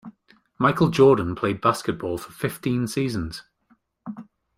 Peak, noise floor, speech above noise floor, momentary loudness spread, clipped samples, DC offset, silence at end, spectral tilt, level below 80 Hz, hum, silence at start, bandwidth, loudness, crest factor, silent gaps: -6 dBFS; -64 dBFS; 42 dB; 22 LU; under 0.1%; under 0.1%; 0.35 s; -6.5 dB/octave; -52 dBFS; none; 0.05 s; 16 kHz; -22 LUFS; 18 dB; none